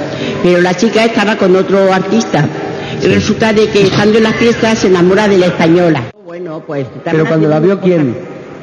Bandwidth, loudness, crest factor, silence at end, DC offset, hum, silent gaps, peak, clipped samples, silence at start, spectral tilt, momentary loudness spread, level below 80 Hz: 10.5 kHz; -10 LUFS; 10 dB; 0 s; under 0.1%; none; none; 0 dBFS; under 0.1%; 0 s; -6 dB/octave; 11 LU; -44 dBFS